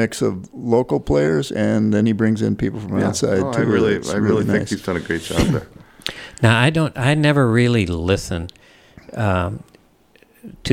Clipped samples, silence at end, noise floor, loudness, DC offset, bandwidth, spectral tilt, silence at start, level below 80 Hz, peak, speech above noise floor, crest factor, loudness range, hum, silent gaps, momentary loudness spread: under 0.1%; 0 s; -54 dBFS; -19 LUFS; under 0.1%; 16 kHz; -6 dB/octave; 0 s; -40 dBFS; 0 dBFS; 35 dB; 18 dB; 2 LU; none; none; 13 LU